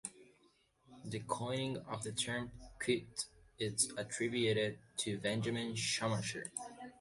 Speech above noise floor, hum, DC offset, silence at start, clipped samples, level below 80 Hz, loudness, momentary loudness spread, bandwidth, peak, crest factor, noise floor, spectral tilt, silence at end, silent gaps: 33 dB; none; under 0.1%; 0.05 s; under 0.1%; -68 dBFS; -38 LUFS; 11 LU; 11.5 kHz; -18 dBFS; 20 dB; -72 dBFS; -3.5 dB/octave; 0.05 s; none